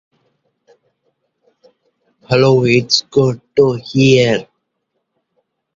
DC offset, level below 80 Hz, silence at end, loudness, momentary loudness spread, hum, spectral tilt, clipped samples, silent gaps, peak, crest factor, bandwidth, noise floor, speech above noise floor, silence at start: under 0.1%; -52 dBFS; 1.35 s; -13 LUFS; 6 LU; none; -5.5 dB/octave; under 0.1%; none; 0 dBFS; 16 dB; 7.6 kHz; -72 dBFS; 59 dB; 2.3 s